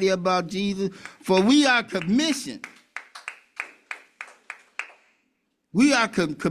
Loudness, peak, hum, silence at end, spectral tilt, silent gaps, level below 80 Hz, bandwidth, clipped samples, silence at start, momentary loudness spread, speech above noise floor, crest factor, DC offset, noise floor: -22 LUFS; -8 dBFS; none; 0 s; -4.5 dB/octave; none; -62 dBFS; 14 kHz; under 0.1%; 0 s; 21 LU; 51 dB; 18 dB; under 0.1%; -73 dBFS